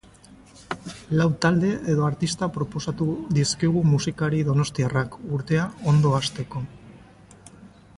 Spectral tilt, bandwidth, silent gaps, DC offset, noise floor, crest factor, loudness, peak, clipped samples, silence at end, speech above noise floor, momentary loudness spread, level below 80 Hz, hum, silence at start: -6 dB/octave; 11.5 kHz; none; under 0.1%; -50 dBFS; 16 dB; -24 LUFS; -8 dBFS; under 0.1%; 0.3 s; 27 dB; 12 LU; -52 dBFS; none; 0.3 s